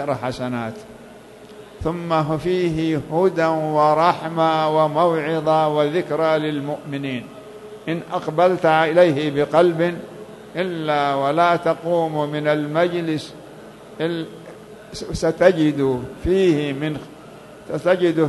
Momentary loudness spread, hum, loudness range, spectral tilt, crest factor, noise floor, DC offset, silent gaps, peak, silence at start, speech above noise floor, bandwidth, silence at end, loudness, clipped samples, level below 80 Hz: 17 LU; none; 4 LU; -6.5 dB/octave; 20 dB; -42 dBFS; under 0.1%; none; 0 dBFS; 0 s; 23 dB; 12.5 kHz; 0 s; -20 LUFS; under 0.1%; -46 dBFS